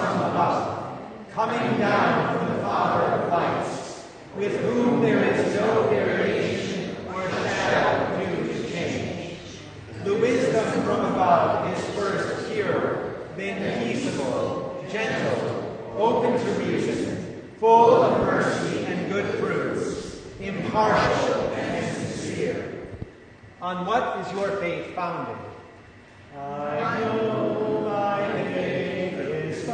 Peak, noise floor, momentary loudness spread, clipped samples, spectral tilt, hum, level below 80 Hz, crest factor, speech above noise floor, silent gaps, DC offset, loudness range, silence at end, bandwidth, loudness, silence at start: -4 dBFS; -48 dBFS; 13 LU; under 0.1%; -6 dB/octave; none; -54 dBFS; 20 dB; 26 dB; none; under 0.1%; 7 LU; 0 s; 9.6 kHz; -24 LUFS; 0 s